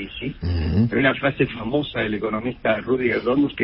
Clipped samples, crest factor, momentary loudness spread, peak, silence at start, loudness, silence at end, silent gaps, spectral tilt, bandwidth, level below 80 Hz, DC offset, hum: under 0.1%; 18 dB; 7 LU; -4 dBFS; 0 s; -22 LUFS; 0 s; none; -11.5 dB/octave; 5.8 kHz; -38 dBFS; under 0.1%; none